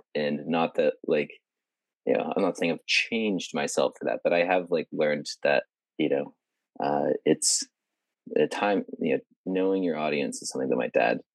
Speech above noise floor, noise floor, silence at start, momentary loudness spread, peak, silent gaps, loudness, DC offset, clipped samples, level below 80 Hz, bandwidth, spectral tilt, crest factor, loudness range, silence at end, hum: 63 dB; -89 dBFS; 0.15 s; 7 LU; -8 dBFS; 9.36-9.44 s; -27 LUFS; under 0.1%; under 0.1%; under -90 dBFS; 12.5 kHz; -3.5 dB/octave; 18 dB; 2 LU; 0.15 s; none